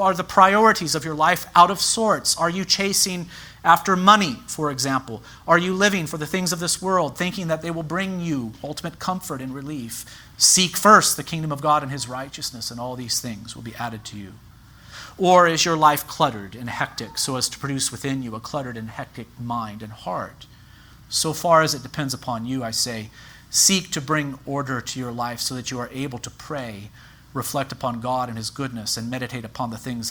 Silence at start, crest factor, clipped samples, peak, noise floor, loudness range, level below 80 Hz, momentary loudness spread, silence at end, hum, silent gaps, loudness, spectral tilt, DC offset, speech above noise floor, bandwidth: 0 s; 22 dB; under 0.1%; 0 dBFS; -47 dBFS; 10 LU; -54 dBFS; 17 LU; 0 s; none; none; -21 LUFS; -3 dB/octave; under 0.1%; 25 dB; over 20 kHz